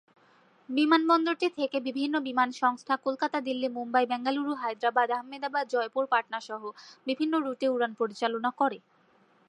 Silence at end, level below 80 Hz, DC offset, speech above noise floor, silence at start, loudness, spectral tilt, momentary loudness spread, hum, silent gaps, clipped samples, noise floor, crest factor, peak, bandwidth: 0.7 s; -86 dBFS; under 0.1%; 35 dB; 0.7 s; -29 LUFS; -4 dB/octave; 8 LU; none; none; under 0.1%; -64 dBFS; 18 dB; -10 dBFS; 10.5 kHz